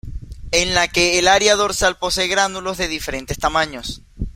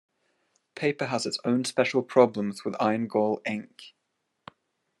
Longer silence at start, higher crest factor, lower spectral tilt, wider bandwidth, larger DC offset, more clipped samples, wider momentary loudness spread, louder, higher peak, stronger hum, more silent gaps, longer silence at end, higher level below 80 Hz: second, 0.05 s vs 0.75 s; about the same, 18 dB vs 22 dB; second, -2 dB/octave vs -5 dB/octave; first, 16.5 kHz vs 12.5 kHz; neither; neither; first, 17 LU vs 11 LU; first, -17 LUFS vs -26 LUFS; first, 0 dBFS vs -6 dBFS; neither; neither; second, 0.05 s vs 1.1 s; first, -34 dBFS vs -78 dBFS